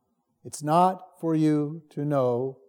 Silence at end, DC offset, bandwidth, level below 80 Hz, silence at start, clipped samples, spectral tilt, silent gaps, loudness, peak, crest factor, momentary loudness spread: 0.15 s; under 0.1%; 17 kHz; -84 dBFS; 0.45 s; under 0.1%; -7.5 dB/octave; none; -25 LUFS; -8 dBFS; 18 dB; 11 LU